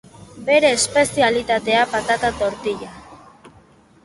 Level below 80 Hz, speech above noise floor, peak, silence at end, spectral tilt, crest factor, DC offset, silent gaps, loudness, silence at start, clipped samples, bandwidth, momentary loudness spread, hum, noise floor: -50 dBFS; 32 dB; -2 dBFS; 0.55 s; -2.5 dB/octave; 18 dB; under 0.1%; none; -18 LUFS; 0.2 s; under 0.1%; 11.5 kHz; 12 LU; none; -51 dBFS